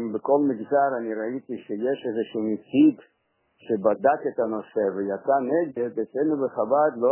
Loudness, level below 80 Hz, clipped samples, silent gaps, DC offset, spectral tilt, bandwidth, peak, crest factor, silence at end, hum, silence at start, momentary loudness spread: -24 LUFS; -72 dBFS; under 0.1%; none; under 0.1%; -10.5 dB/octave; 3.2 kHz; -6 dBFS; 18 dB; 0 s; none; 0 s; 8 LU